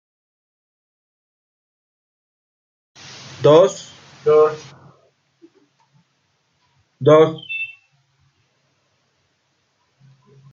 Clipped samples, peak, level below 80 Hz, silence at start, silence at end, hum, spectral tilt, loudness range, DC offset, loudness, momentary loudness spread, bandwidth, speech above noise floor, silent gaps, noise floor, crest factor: under 0.1%; -2 dBFS; -66 dBFS; 3.4 s; 2.8 s; none; -6 dB/octave; 4 LU; under 0.1%; -16 LUFS; 25 LU; 7.6 kHz; 53 dB; none; -67 dBFS; 20 dB